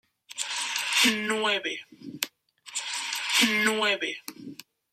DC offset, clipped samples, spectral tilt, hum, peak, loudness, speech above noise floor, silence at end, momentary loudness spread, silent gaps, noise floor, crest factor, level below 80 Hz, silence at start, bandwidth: under 0.1%; under 0.1%; -1 dB/octave; none; -6 dBFS; -26 LUFS; 23 dB; 0.4 s; 19 LU; none; -50 dBFS; 22 dB; -78 dBFS; 0.3 s; 16 kHz